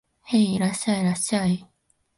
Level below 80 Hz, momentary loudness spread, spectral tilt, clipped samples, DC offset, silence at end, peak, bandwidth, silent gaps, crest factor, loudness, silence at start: -60 dBFS; 4 LU; -5 dB/octave; under 0.1%; under 0.1%; 0.55 s; -8 dBFS; 11.5 kHz; none; 16 dB; -23 LUFS; 0.25 s